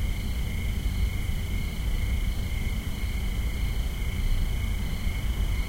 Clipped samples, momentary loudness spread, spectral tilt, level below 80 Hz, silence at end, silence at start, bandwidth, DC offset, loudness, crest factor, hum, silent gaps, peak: under 0.1%; 2 LU; -5 dB/octave; -28 dBFS; 0 s; 0 s; 16 kHz; under 0.1%; -31 LUFS; 12 dB; none; none; -14 dBFS